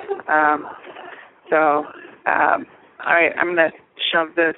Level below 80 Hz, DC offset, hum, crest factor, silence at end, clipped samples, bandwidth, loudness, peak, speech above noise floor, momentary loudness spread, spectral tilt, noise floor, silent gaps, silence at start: -68 dBFS; under 0.1%; none; 20 dB; 0.05 s; under 0.1%; 4.1 kHz; -19 LUFS; 0 dBFS; 22 dB; 19 LU; 0 dB/octave; -40 dBFS; none; 0 s